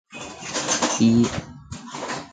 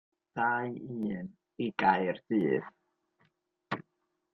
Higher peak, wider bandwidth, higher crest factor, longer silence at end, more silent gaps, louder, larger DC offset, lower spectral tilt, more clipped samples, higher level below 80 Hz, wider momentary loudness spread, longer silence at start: first, -6 dBFS vs -12 dBFS; first, 9.4 kHz vs 6.2 kHz; about the same, 18 dB vs 22 dB; second, 0.05 s vs 0.55 s; neither; first, -22 LUFS vs -32 LUFS; neither; second, -4 dB/octave vs -8 dB/octave; neither; first, -50 dBFS vs -72 dBFS; first, 19 LU vs 14 LU; second, 0.1 s vs 0.35 s